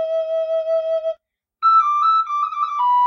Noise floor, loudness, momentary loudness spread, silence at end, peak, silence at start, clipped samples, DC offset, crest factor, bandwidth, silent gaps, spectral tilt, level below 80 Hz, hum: -49 dBFS; -18 LUFS; 9 LU; 0 s; -8 dBFS; 0 s; under 0.1%; under 0.1%; 12 dB; 6.8 kHz; none; -0.5 dB/octave; -70 dBFS; none